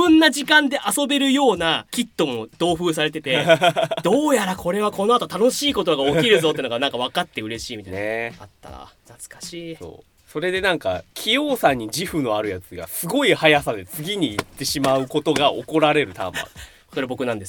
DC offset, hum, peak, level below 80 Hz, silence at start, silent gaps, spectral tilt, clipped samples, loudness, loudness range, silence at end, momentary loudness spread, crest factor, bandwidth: under 0.1%; none; 0 dBFS; -52 dBFS; 0 s; none; -3.5 dB/octave; under 0.1%; -20 LUFS; 8 LU; 0 s; 14 LU; 20 dB; 19 kHz